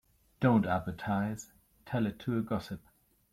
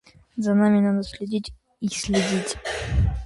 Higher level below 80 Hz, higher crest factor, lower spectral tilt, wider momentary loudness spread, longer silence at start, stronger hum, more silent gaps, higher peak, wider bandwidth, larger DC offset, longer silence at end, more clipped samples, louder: second, -60 dBFS vs -34 dBFS; about the same, 18 dB vs 16 dB; first, -7 dB/octave vs -5.5 dB/octave; first, 17 LU vs 11 LU; about the same, 0.4 s vs 0.35 s; neither; neither; second, -14 dBFS vs -8 dBFS; first, 15.5 kHz vs 11.5 kHz; neither; first, 0.55 s vs 0 s; neither; second, -32 LUFS vs -24 LUFS